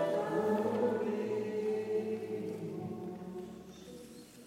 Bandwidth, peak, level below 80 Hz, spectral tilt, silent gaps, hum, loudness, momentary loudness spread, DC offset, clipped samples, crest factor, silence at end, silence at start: 15.5 kHz; -20 dBFS; -74 dBFS; -7 dB/octave; none; none; -36 LUFS; 18 LU; under 0.1%; under 0.1%; 16 dB; 0 s; 0 s